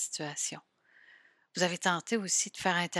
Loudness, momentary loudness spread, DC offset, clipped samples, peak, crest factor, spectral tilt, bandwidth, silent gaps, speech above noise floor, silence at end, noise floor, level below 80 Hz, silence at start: -31 LUFS; 8 LU; under 0.1%; under 0.1%; -12 dBFS; 22 dB; -2 dB/octave; 14 kHz; none; 30 dB; 0 s; -62 dBFS; -78 dBFS; 0 s